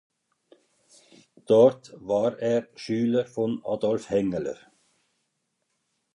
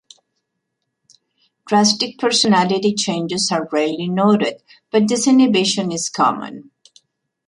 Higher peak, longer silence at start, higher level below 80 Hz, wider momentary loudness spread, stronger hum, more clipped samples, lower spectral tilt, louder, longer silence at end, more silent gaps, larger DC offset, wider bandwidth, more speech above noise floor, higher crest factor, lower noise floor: second, -6 dBFS vs -2 dBFS; second, 1.5 s vs 1.65 s; about the same, -66 dBFS vs -64 dBFS; first, 13 LU vs 7 LU; neither; neither; first, -7 dB/octave vs -4 dB/octave; second, -25 LUFS vs -17 LUFS; first, 1.6 s vs 0.85 s; neither; neither; about the same, 11 kHz vs 11.5 kHz; second, 53 dB vs 59 dB; first, 22 dB vs 16 dB; about the same, -77 dBFS vs -76 dBFS